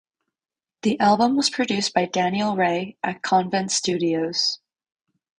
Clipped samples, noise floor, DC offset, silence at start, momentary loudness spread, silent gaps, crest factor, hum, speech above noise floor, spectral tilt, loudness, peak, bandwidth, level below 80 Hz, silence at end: under 0.1%; under -90 dBFS; under 0.1%; 0.85 s; 7 LU; none; 16 dB; none; over 68 dB; -3.5 dB/octave; -22 LUFS; -6 dBFS; 10.5 kHz; -64 dBFS; 0.85 s